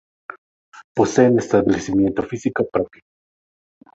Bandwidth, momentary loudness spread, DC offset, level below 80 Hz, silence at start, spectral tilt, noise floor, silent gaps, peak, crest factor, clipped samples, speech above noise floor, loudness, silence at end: 8 kHz; 19 LU; under 0.1%; -50 dBFS; 0.75 s; -6.5 dB/octave; under -90 dBFS; 0.84-0.95 s; -2 dBFS; 20 dB; under 0.1%; over 72 dB; -19 LUFS; 1.05 s